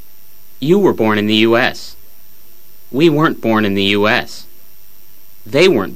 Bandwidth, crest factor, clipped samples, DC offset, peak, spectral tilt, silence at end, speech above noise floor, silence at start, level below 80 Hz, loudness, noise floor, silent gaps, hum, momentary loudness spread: 15.5 kHz; 16 dB; under 0.1%; 4%; 0 dBFS; -5.5 dB/octave; 0 s; 32 dB; 0.6 s; -54 dBFS; -13 LUFS; -45 dBFS; none; none; 15 LU